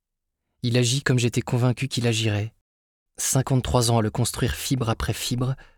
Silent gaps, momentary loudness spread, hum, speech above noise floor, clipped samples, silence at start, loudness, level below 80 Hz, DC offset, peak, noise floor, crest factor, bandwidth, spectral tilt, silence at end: 2.61-3.06 s; 5 LU; none; 58 dB; under 0.1%; 0.65 s; -23 LUFS; -42 dBFS; under 0.1%; -6 dBFS; -81 dBFS; 18 dB; 18.5 kHz; -4.5 dB/octave; 0.15 s